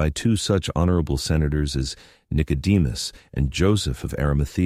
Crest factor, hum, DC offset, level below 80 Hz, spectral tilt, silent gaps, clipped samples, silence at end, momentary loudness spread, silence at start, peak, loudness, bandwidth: 14 dB; none; under 0.1%; -30 dBFS; -6 dB/octave; none; under 0.1%; 0 s; 8 LU; 0 s; -8 dBFS; -23 LUFS; 15 kHz